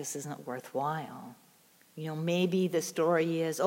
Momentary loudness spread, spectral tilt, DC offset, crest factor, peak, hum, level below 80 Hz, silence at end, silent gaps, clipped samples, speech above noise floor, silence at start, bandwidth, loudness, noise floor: 17 LU; -5 dB/octave; under 0.1%; 18 dB; -14 dBFS; none; -86 dBFS; 0 s; none; under 0.1%; 31 dB; 0 s; 17 kHz; -32 LUFS; -63 dBFS